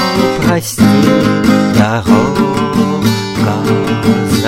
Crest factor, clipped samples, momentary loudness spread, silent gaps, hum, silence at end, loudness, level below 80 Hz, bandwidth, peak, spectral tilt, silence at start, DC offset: 10 dB; under 0.1%; 4 LU; none; none; 0 s; -11 LUFS; -36 dBFS; 16.5 kHz; 0 dBFS; -6 dB/octave; 0 s; under 0.1%